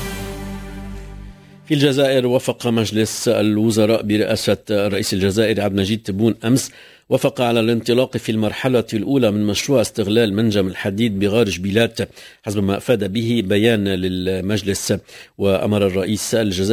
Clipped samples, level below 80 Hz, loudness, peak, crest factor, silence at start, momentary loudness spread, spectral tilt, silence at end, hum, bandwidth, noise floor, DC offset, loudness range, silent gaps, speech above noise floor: under 0.1%; -42 dBFS; -18 LUFS; 0 dBFS; 18 dB; 0 s; 9 LU; -5.5 dB/octave; 0 s; none; 16 kHz; -38 dBFS; under 0.1%; 2 LU; none; 21 dB